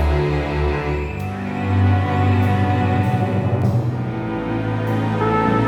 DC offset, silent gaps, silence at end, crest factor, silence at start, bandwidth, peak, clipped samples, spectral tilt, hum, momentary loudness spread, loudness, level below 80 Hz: under 0.1%; none; 0 s; 14 dB; 0 s; 8 kHz; -4 dBFS; under 0.1%; -8.5 dB/octave; none; 7 LU; -20 LUFS; -30 dBFS